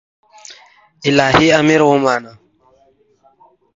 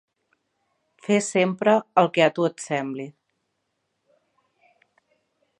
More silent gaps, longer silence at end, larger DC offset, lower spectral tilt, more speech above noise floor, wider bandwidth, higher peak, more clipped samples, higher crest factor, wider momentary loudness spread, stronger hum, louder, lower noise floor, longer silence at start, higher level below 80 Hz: neither; second, 1.45 s vs 2.5 s; neither; about the same, -5 dB/octave vs -5 dB/octave; second, 43 dB vs 55 dB; second, 7.8 kHz vs 11 kHz; about the same, 0 dBFS vs -2 dBFS; neither; second, 16 dB vs 24 dB; second, 9 LU vs 15 LU; neither; first, -13 LUFS vs -22 LUFS; second, -55 dBFS vs -76 dBFS; second, 0.5 s vs 1.1 s; first, -48 dBFS vs -80 dBFS